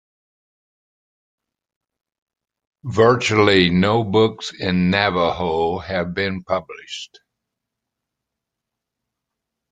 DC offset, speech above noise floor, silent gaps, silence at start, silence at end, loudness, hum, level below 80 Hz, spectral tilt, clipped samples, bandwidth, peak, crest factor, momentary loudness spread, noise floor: under 0.1%; 64 dB; none; 2.85 s; 2.65 s; -18 LUFS; none; -54 dBFS; -5.5 dB/octave; under 0.1%; 9.2 kHz; 0 dBFS; 22 dB; 17 LU; -83 dBFS